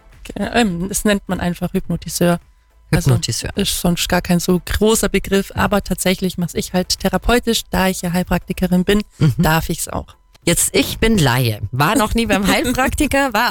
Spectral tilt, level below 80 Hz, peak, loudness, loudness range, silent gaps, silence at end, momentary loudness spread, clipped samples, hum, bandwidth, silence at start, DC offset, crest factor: -4.5 dB/octave; -30 dBFS; -4 dBFS; -17 LUFS; 2 LU; none; 0 s; 7 LU; under 0.1%; none; 19 kHz; 0.2 s; under 0.1%; 12 dB